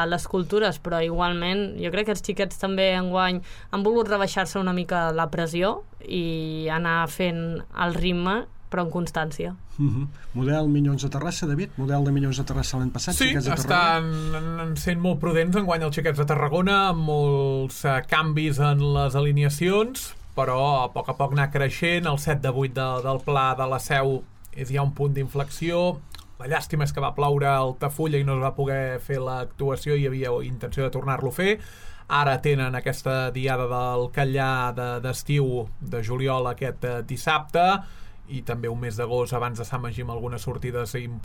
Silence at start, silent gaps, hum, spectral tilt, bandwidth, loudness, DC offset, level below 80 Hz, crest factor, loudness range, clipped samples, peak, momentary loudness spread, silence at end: 0 s; none; none; -5.5 dB/octave; 17.5 kHz; -25 LUFS; under 0.1%; -40 dBFS; 18 dB; 4 LU; under 0.1%; -6 dBFS; 8 LU; 0 s